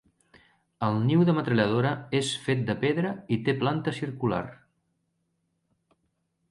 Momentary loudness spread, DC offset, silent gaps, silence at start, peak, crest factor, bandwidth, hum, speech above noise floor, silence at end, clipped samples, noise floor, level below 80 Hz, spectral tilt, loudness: 7 LU; under 0.1%; none; 0.8 s; -10 dBFS; 18 dB; 11.5 kHz; none; 50 dB; 1.95 s; under 0.1%; -76 dBFS; -62 dBFS; -6.5 dB/octave; -27 LUFS